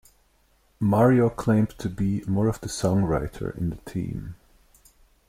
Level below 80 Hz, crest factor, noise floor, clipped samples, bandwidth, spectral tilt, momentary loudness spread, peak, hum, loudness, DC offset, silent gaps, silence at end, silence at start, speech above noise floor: -44 dBFS; 18 dB; -63 dBFS; under 0.1%; 16 kHz; -7.5 dB/octave; 13 LU; -6 dBFS; none; -24 LUFS; under 0.1%; none; 0.95 s; 0.8 s; 40 dB